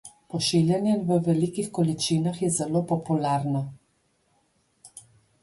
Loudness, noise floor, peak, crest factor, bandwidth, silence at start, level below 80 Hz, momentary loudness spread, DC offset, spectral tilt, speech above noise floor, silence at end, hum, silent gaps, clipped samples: -25 LUFS; -69 dBFS; -10 dBFS; 16 dB; 11.5 kHz; 0.05 s; -64 dBFS; 7 LU; under 0.1%; -5.5 dB/octave; 44 dB; 0.4 s; none; none; under 0.1%